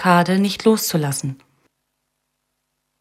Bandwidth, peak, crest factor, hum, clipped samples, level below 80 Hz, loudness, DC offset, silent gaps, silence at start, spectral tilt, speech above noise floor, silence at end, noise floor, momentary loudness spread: 16 kHz; -2 dBFS; 18 dB; 50 Hz at -50 dBFS; under 0.1%; -62 dBFS; -18 LUFS; under 0.1%; none; 0 s; -5 dB/octave; 57 dB; 1.65 s; -74 dBFS; 10 LU